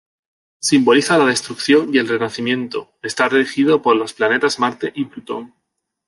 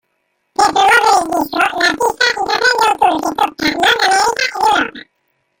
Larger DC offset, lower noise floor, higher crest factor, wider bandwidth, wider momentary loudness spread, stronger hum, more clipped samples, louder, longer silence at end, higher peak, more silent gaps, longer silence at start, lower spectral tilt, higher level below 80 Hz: neither; first, -75 dBFS vs -67 dBFS; about the same, 16 dB vs 14 dB; second, 11.5 kHz vs 17 kHz; first, 13 LU vs 6 LU; neither; neither; second, -17 LUFS vs -13 LUFS; about the same, 0.6 s vs 0.6 s; about the same, -2 dBFS vs 0 dBFS; neither; about the same, 0.6 s vs 0.6 s; first, -4 dB/octave vs -1.5 dB/octave; second, -64 dBFS vs -50 dBFS